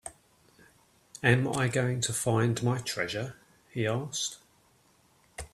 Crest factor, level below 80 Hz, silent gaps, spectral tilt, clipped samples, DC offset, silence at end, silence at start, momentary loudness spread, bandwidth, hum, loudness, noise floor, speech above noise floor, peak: 24 dB; -60 dBFS; none; -4.5 dB/octave; under 0.1%; under 0.1%; 0.1 s; 0.05 s; 20 LU; 14 kHz; none; -29 LUFS; -65 dBFS; 36 dB; -8 dBFS